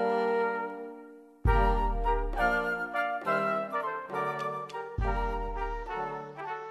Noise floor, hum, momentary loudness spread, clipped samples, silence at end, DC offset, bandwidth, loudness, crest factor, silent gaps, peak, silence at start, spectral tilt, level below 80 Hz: -50 dBFS; none; 11 LU; under 0.1%; 0 s; under 0.1%; 12 kHz; -31 LUFS; 18 dB; none; -14 dBFS; 0 s; -7 dB/octave; -36 dBFS